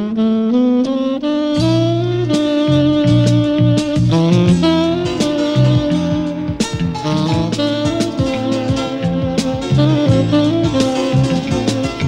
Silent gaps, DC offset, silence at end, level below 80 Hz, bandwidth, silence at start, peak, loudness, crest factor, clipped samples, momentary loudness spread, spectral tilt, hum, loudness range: none; under 0.1%; 0 s; -36 dBFS; 11.5 kHz; 0 s; -2 dBFS; -15 LUFS; 12 dB; under 0.1%; 6 LU; -7 dB/octave; none; 4 LU